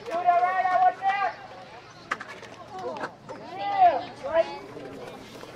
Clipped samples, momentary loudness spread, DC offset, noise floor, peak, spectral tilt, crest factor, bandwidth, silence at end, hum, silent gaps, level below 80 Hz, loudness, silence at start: under 0.1%; 20 LU; under 0.1%; -46 dBFS; -10 dBFS; -4.5 dB/octave; 18 dB; 9.6 kHz; 0 s; none; none; -66 dBFS; -25 LUFS; 0 s